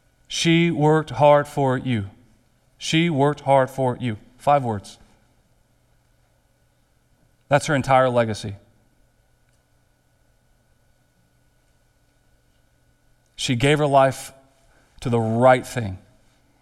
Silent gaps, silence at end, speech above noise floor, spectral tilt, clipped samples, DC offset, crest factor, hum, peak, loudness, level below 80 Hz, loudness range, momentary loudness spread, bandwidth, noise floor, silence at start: none; 0.65 s; 43 dB; -5.5 dB/octave; under 0.1%; under 0.1%; 20 dB; none; -2 dBFS; -20 LUFS; -54 dBFS; 8 LU; 15 LU; 14 kHz; -62 dBFS; 0.3 s